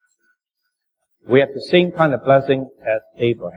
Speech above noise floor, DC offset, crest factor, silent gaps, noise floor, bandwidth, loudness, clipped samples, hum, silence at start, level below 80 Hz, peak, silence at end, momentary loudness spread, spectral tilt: 59 dB; under 0.1%; 18 dB; none; -76 dBFS; 10 kHz; -18 LUFS; under 0.1%; none; 1.25 s; -60 dBFS; -2 dBFS; 0.05 s; 8 LU; -8 dB/octave